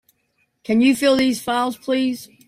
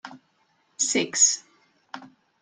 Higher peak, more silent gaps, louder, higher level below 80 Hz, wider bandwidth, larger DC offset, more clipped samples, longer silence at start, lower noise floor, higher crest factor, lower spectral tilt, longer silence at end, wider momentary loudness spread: about the same, -6 dBFS vs -6 dBFS; neither; about the same, -19 LUFS vs -21 LUFS; first, -60 dBFS vs -76 dBFS; first, 16 kHz vs 11 kHz; neither; neither; first, 0.7 s vs 0.05 s; about the same, -68 dBFS vs -67 dBFS; second, 14 dB vs 22 dB; first, -4 dB/octave vs 0 dB/octave; about the same, 0.25 s vs 0.35 s; second, 7 LU vs 24 LU